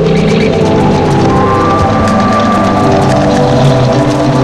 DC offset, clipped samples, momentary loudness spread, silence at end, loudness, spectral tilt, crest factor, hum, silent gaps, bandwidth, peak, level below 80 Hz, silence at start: under 0.1%; under 0.1%; 1 LU; 0 s; -9 LUFS; -7 dB/octave; 8 dB; none; none; 11.5 kHz; 0 dBFS; -26 dBFS; 0 s